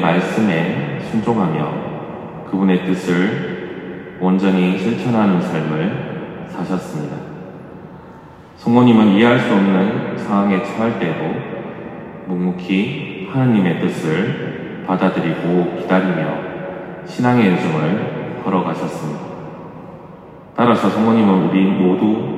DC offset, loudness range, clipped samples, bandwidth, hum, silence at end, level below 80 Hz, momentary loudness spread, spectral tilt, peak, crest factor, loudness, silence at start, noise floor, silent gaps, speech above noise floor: under 0.1%; 5 LU; under 0.1%; 10.5 kHz; none; 0 s; -56 dBFS; 17 LU; -7.5 dB/octave; 0 dBFS; 16 dB; -17 LUFS; 0 s; -39 dBFS; none; 23 dB